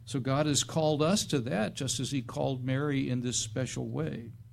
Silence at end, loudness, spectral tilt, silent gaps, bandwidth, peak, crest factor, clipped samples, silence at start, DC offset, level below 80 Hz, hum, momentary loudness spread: 0.05 s; -31 LUFS; -4.5 dB/octave; none; 14.5 kHz; -14 dBFS; 18 dB; under 0.1%; 0 s; under 0.1%; -58 dBFS; none; 7 LU